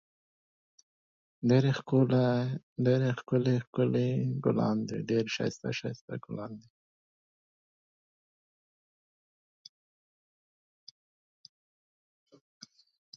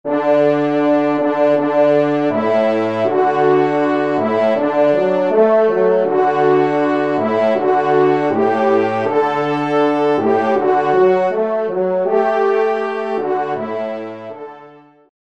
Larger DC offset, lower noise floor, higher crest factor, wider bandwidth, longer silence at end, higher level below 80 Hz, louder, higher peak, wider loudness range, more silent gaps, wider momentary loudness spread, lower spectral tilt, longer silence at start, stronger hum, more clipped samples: second, under 0.1% vs 0.4%; first, under -90 dBFS vs -42 dBFS; first, 20 dB vs 12 dB; about the same, 7.4 kHz vs 7.8 kHz; first, 6.55 s vs 0.6 s; about the same, -72 dBFS vs -68 dBFS; second, -30 LUFS vs -15 LUFS; second, -12 dBFS vs -2 dBFS; first, 16 LU vs 2 LU; first, 2.63-2.76 s, 3.67-3.73 s, 6.01-6.08 s vs none; first, 14 LU vs 6 LU; about the same, -7.5 dB/octave vs -7.5 dB/octave; first, 1.4 s vs 0.05 s; neither; neither